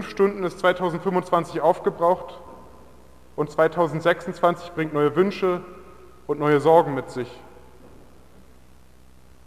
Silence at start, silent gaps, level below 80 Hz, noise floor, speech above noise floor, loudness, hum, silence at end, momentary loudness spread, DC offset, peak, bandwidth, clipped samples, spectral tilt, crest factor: 0 s; none; -56 dBFS; -53 dBFS; 31 dB; -22 LUFS; none; 2 s; 14 LU; 0.3%; -4 dBFS; 15.5 kHz; under 0.1%; -7 dB/octave; 20 dB